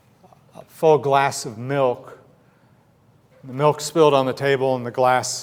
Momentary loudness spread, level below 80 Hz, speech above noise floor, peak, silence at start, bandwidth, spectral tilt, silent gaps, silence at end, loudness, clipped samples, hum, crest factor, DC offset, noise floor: 9 LU; -68 dBFS; 37 dB; -4 dBFS; 0.55 s; 16.5 kHz; -4.5 dB/octave; none; 0 s; -19 LUFS; under 0.1%; none; 18 dB; under 0.1%; -56 dBFS